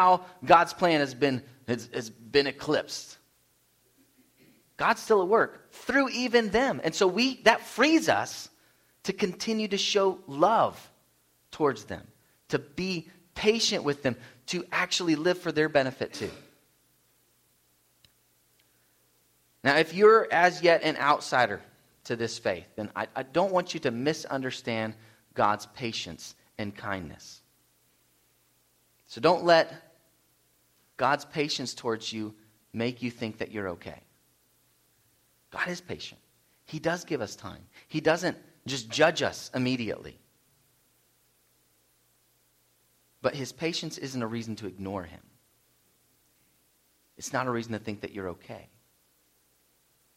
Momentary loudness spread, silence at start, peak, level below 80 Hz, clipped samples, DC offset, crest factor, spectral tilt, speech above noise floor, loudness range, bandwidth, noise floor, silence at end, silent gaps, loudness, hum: 17 LU; 0 s; -4 dBFS; -66 dBFS; under 0.1%; under 0.1%; 26 dB; -4 dB/octave; 41 dB; 13 LU; 16 kHz; -68 dBFS; 1.55 s; none; -27 LUFS; 60 Hz at -65 dBFS